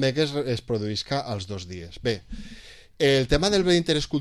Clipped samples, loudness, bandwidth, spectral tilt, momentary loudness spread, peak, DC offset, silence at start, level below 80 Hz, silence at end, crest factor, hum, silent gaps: under 0.1%; -24 LUFS; 12.5 kHz; -5 dB/octave; 18 LU; -8 dBFS; 0.2%; 0 s; -40 dBFS; 0 s; 18 dB; none; none